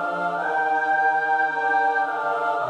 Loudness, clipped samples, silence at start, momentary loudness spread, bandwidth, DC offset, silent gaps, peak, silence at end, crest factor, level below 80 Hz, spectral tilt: -22 LUFS; under 0.1%; 0 s; 4 LU; 9.2 kHz; under 0.1%; none; -10 dBFS; 0 s; 12 dB; -78 dBFS; -4.5 dB/octave